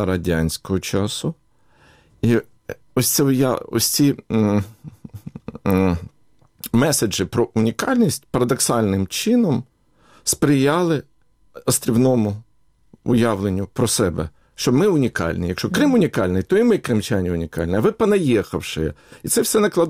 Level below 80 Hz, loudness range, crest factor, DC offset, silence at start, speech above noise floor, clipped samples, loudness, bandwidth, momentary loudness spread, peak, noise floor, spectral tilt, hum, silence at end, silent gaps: -44 dBFS; 3 LU; 16 dB; under 0.1%; 0 s; 37 dB; under 0.1%; -19 LUFS; 16.5 kHz; 11 LU; -4 dBFS; -55 dBFS; -5 dB/octave; none; 0 s; none